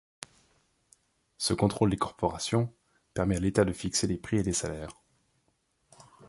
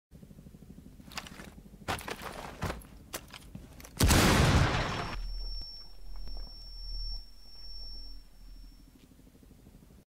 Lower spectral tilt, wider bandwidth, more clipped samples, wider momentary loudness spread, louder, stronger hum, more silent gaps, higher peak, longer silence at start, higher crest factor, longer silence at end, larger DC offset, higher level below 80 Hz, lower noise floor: about the same, -5 dB/octave vs -4.5 dB/octave; second, 11.5 kHz vs 16 kHz; neither; second, 15 LU vs 28 LU; about the same, -29 LUFS vs -31 LUFS; neither; neither; about the same, -10 dBFS vs -12 dBFS; first, 1.4 s vs 0.1 s; about the same, 22 dB vs 24 dB; about the same, 0 s vs 0.1 s; neither; second, -50 dBFS vs -40 dBFS; first, -74 dBFS vs -57 dBFS